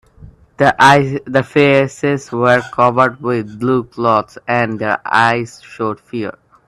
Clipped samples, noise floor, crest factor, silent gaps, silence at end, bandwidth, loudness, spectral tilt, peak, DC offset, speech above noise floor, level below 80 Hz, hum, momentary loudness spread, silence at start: under 0.1%; -41 dBFS; 14 dB; none; 0.35 s; 13 kHz; -14 LUFS; -6 dB/octave; 0 dBFS; under 0.1%; 27 dB; -50 dBFS; none; 13 LU; 0.6 s